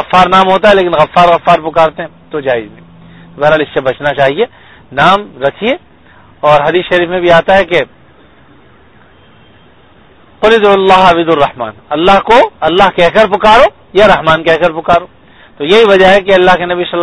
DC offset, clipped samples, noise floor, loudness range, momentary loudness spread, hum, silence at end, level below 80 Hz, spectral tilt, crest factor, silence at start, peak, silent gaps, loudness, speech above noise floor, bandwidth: under 0.1%; 2%; -42 dBFS; 6 LU; 10 LU; none; 0 s; -36 dBFS; -5.5 dB/octave; 10 dB; 0 s; 0 dBFS; none; -8 LUFS; 34 dB; 11 kHz